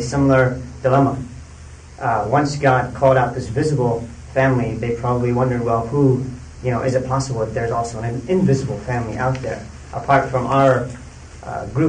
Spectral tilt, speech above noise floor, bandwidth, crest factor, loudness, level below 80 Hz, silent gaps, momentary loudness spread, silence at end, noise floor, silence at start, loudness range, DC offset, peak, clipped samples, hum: -7 dB/octave; 20 dB; 9.8 kHz; 16 dB; -19 LUFS; -40 dBFS; none; 14 LU; 0 s; -38 dBFS; 0 s; 3 LU; under 0.1%; -4 dBFS; under 0.1%; none